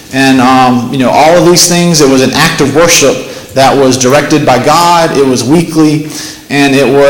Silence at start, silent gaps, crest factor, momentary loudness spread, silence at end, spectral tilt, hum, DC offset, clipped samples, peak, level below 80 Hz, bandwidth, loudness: 0 s; none; 6 dB; 5 LU; 0 s; -4 dB/octave; none; under 0.1%; 0.5%; 0 dBFS; -36 dBFS; over 20 kHz; -6 LUFS